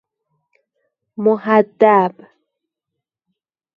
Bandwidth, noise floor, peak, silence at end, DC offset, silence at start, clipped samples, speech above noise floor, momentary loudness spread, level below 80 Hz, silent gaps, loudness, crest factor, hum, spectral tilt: 5 kHz; -82 dBFS; 0 dBFS; 1.65 s; under 0.1%; 1.2 s; under 0.1%; 67 dB; 9 LU; -70 dBFS; none; -15 LUFS; 20 dB; none; -9 dB/octave